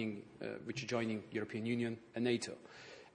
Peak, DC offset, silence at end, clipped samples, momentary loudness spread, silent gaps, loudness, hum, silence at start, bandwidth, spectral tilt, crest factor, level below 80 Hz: -22 dBFS; under 0.1%; 0.05 s; under 0.1%; 12 LU; none; -40 LUFS; none; 0 s; 10 kHz; -5.5 dB/octave; 18 dB; -78 dBFS